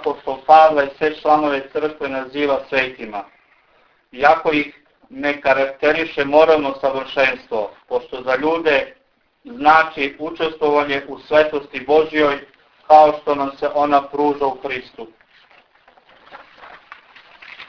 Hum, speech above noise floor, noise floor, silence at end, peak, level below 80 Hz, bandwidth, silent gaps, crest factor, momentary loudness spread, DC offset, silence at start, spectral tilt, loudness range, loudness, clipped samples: none; 40 dB; -57 dBFS; 0.05 s; 0 dBFS; -54 dBFS; 5.4 kHz; none; 18 dB; 13 LU; under 0.1%; 0 s; -5.5 dB/octave; 5 LU; -17 LUFS; under 0.1%